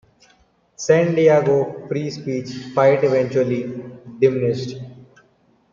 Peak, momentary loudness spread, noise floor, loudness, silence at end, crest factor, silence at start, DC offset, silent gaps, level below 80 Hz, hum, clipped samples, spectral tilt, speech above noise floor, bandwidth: -2 dBFS; 16 LU; -59 dBFS; -19 LUFS; 0.7 s; 18 dB; 0.8 s; under 0.1%; none; -62 dBFS; none; under 0.1%; -6.5 dB/octave; 41 dB; 7.4 kHz